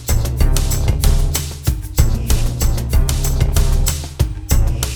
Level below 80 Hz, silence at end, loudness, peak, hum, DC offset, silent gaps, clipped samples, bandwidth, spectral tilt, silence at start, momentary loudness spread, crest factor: -16 dBFS; 0 s; -18 LUFS; 0 dBFS; none; under 0.1%; none; under 0.1%; over 20 kHz; -4.5 dB/octave; 0 s; 4 LU; 14 dB